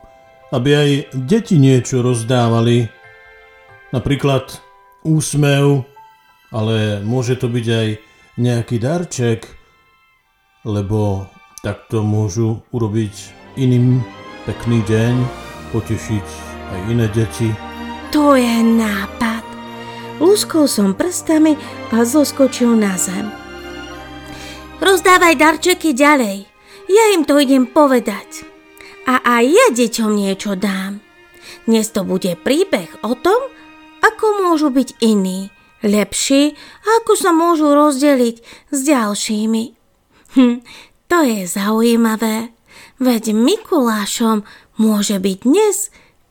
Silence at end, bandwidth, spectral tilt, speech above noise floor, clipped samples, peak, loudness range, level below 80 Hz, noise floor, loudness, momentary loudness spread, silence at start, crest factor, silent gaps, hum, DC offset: 0.45 s; 18.5 kHz; -5.5 dB/octave; 43 dB; under 0.1%; 0 dBFS; 6 LU; -46 dBFS; -58 dBFS; -15 LUFS; 17 LU; 0.5 s; 16 dB; none; none; under 0.1%